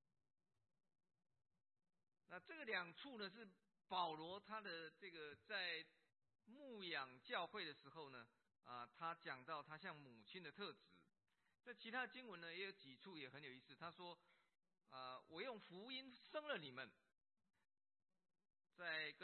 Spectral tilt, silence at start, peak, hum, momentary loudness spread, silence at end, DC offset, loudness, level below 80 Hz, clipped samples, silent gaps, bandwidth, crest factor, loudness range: -0.5 dB/octave; 2.3 s; -32 dBFS; none; 13 LU; 0 s; under 0.1%; -53 LUFS; under -90 dBFS; under 0.1%; none; 4.3 kHz; 24 dB; 5 LU